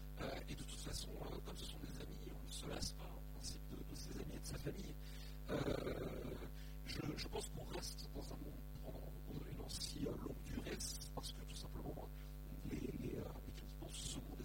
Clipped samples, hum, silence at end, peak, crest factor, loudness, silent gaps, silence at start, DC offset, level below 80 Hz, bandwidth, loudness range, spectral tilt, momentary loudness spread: under 0.1%; none; 0 s; -28 dBFS; 20 dB; -49 LUFS; none; 0 s; under 0.1%; -52 dBFS; 16.5 kHz; 3 LU; -4.5 dB/octave; 7 LU